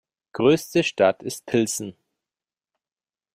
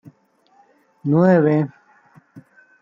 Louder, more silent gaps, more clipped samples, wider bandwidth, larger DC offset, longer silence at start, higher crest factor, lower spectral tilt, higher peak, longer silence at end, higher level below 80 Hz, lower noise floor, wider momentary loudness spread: second, -22 LUFS vs -17 LUFS; neither; neither; first, 16 kHz vs 7 kHz; neither; second, 0.35 s vs 1.05 s; about the same, 20 dB vs 18 dB; second, -4.5 dB/octave vs -10.5 dB/octave; about the same, -4 dBFS vs -4 dBFS; first, 1.45 s vs 0.4 s; about the same, -64 dBFS vs -66 dBFS; first, under -90 dBFS vs -58 dBFS; about the same, 13 LU vs 15 LU